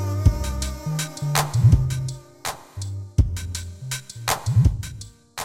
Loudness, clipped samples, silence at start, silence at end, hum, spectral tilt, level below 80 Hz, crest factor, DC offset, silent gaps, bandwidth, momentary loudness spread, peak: -24 LUFS; under 0.1%; 0 s; 0 s; none; -5 dB/octave; -30 dBFS; 16 dB; under 0.1%; none; 16 kHz; 14 LU; -6 dBFS